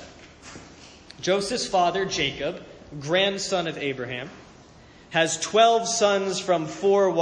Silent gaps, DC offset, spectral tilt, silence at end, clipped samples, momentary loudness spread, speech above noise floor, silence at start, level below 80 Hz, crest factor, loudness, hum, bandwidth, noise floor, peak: none; under 0.1%; -3 dB/octave; 0 s; under 0.1%; 21 LU; 26 dB; 0 s; -58 dBFS; 20 dB; -23 LUFS; none; 10.5 kHz; -50 dBFS; -6 dBFS